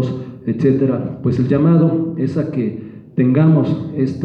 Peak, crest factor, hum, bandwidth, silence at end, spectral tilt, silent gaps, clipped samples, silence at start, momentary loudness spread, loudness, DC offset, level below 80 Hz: -4 dBFS; 12 dB; none; 5.4 kHz; 0 s; -10.5 dB/octave; none; under 0.1%; 0 s; 11 LU; -17 LUFS; under 0.1%; -50 dBFS